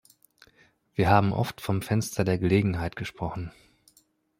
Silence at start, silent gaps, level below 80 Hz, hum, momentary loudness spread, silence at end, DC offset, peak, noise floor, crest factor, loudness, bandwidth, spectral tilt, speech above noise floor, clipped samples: 1 s; none; -52 dBFS; none; 13 LU; 0.9 s; under 0.1%; -4 dBFS; -65 dBFS; 22 dB; -26 LUFS; 16.5 kHz; -6.5 dB/octave; 40 dB; under 0.1%